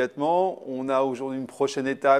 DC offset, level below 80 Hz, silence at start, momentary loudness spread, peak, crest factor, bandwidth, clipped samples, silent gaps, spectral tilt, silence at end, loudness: under 0.1%; -74 dBFS; 0 s; 8 LU; -6 dBFS; 18 dB; 12 kHz; under 0.1%; none; -5.5 dB/octave; 0 s; -26 LUFS